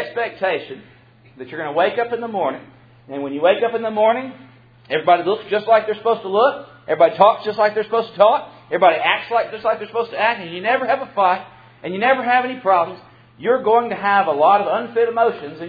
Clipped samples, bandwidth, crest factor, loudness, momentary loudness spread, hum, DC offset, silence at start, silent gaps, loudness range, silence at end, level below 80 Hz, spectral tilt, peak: under 0.1%; 5 kHz; 18 dB; -18 LUFS; 11 LU; none; under 0.1%; 0 s; none; 4 LU; 0 s; -66 dBFS; -7.5 dB/octave; 0 dBFS